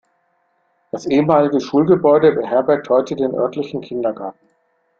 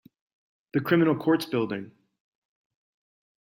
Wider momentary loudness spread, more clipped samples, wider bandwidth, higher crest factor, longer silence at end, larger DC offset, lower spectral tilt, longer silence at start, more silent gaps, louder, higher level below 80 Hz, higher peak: first, 14 LU vs 10 LU; neither; second, 7.2 kHz vs 16.5 kHz; about the same, 16 dB vs 20 dB; second, 0.7 s vs 1.55 s; neither; about the same, -7.5 dB/octave vs -7 dB/octave; first, 0.95 s vs 0.75 s; neither; first, -16 LUFS vs -25 LUFS; first, -58 dBFS vs -72 dBFS; first, -2 dBFS vs -10 dBFS